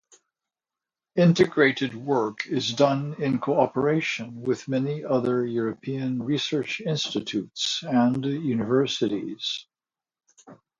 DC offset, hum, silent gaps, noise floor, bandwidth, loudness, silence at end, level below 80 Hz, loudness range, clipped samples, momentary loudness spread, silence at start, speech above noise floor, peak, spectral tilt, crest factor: under 0.1%; none; none; under -90 dBFS; 7.6 kHz; -25 LUFS; 0.25 s; -66 dBFS; 3 LU; under 0.1%; 8 LU; 1.15 s; over 66 dB; -6 dBFS; -5.5 dB/octave; 20 dB